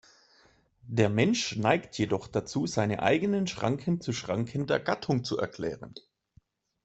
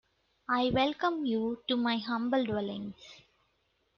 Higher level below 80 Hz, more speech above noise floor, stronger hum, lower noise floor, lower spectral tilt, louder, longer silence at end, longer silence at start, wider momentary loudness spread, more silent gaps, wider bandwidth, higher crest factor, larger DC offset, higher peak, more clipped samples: about the same, -62 dBFS vs -62 dBFS; second, 36 dB vs 44 dB; neither; second, -64 dBFS vs -75 dBFS; about the same, -5.5 dB/octave vs -6.5 dB/octave; about the same, -29 LUFS vs -31 LUFS; about the same, 0.85 s vs 0.8 s; first, 0.85 s vs 0.5 s; second, 8 LU vs 13 LU; neither; first, 8.2 kHz vs 7 kHz; first, 22 dB vs 16 dB; neither; first, -8 dBFS vs -16 dBFS; neither